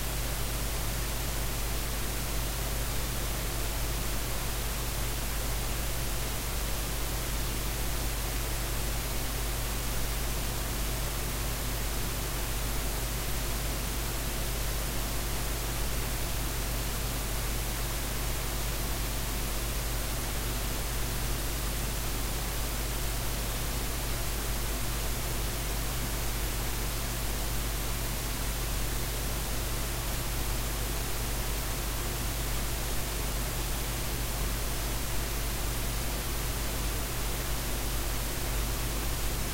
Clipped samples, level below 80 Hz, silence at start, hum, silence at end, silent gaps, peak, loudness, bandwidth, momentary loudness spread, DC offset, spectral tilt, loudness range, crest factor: under 0.1%; -34 dBFS; 0 s; none; 0 s; none; -18 dBFS; -32 LUFS; 16 kHz; 0 LU; under 0.1%; -3 dB/octave; 0 LU; 14 dB